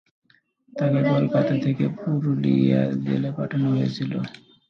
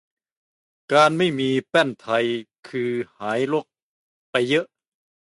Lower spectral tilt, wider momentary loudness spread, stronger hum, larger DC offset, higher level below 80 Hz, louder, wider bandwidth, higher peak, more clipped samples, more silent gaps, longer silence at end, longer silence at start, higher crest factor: first, -9 dB/octave vs -5 dB/octave; second, 8 LU vs 11 LU; neither; neither; first, -64 dBFS vs -70 dBFS; about the same, -23 LUFS vs -22 LUFS; second, 6.4 kHz vs 11.5 kHz; second, -8 dBFS vs -4 dBFS; neither; second, none vs 2.59-2.63 s, 3.82-4.33 s; second, 0.35 s vs 0.6 s; second, 0.75 s vs 0.9 s; about the same, 16 dB vs 20 dB